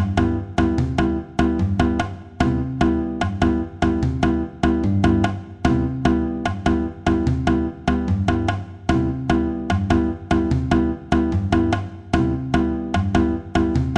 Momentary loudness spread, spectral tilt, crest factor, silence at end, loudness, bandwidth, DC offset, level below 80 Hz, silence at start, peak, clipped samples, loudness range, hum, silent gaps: 3 LU; -7.5 dB/octave; 16 dB; 0 s; -21 LUFS; 9.6 kHz; under 0.1%; -30 dBFS; 0 s; -4 dBFS; under 0.1%; 1 LU; none; none